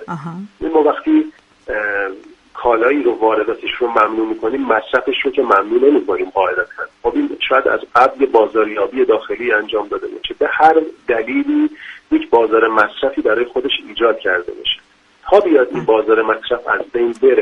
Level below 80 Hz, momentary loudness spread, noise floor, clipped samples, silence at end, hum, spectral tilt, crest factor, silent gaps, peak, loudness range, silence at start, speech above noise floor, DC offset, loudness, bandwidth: -50 dBFS; 8 LU; -48 dBFS; under 0.1%; 0 s; none; -6 dB/octave; 16 dB; none; 0 dBFS; 2 LU; 0 s; 33 dB; under 0.1%; -15 LUFS; 7 kHz